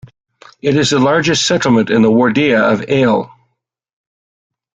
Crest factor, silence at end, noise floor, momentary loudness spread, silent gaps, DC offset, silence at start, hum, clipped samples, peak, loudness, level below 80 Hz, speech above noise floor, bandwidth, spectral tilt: 14 dB; 1.5 s; -69 dBFS; 5 LU; none; under 0.1%; 0.65 s; none; under 0.1%; 0 dBFS; -12 LUFS; -50 dBFS; 57 dB; 9.4 kHz; -4.5 dB/octave